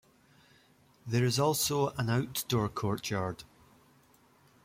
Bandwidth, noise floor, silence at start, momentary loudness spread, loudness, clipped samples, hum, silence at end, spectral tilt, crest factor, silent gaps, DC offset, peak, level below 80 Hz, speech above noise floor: 16.5 kHz; -64 dBFS; 1.05 s; 9 LU; -31 LUFS; under 0.1%; none; 1.2 s; -4.5 dB/octave; 18 dB; none; under 0.1%; -16 dBFS; -62 dBFS; 33 dB